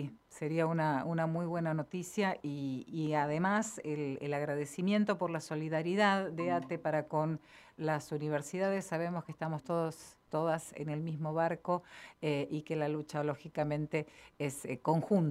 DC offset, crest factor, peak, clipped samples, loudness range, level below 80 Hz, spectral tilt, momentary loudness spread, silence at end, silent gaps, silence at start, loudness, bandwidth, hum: under 0.1%; 20 dB; -14 dBFS; under 0.1%; 3 LU; -72 dBFS; -6.5 dB/octave; 8 LU; 0 s; none; 0 s; -35 LUFS; 14.5 kHz; none